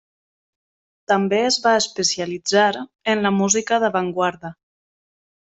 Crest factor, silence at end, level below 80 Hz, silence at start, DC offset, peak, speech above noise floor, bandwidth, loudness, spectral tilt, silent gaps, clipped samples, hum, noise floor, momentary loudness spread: 18 dB; 0.95 s; -64 dBFS; 1.1 s; under 0.1%; -4 dBFS; over 71 dB; 8.4 kHz; -19 LUFS; -3 dB/octave; none; under 0.1%; none; under -90 dBFS; 7 LU